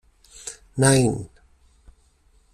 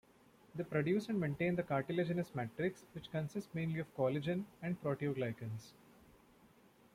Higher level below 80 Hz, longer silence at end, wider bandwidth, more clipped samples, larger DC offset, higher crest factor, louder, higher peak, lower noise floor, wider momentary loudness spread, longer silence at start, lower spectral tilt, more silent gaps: first, -50 dBFS vs -70 dBFS; about the same, 1.25 s vs 1.25 s; second, 14 kHz vs 15.5 kHz; neither; neither; first, 22 dB vs 16 dB; first, -20 LUFS vs -39 LUFS; first, -4 dBFS vs -24 dBFS; second, -59 dBFS vs -66 dBFS; first, 20 LU vs 11 LU; about the same, 0.45 s vs 0.55 s; second, -5 dB/octave vs -7.5 dB/octave; neither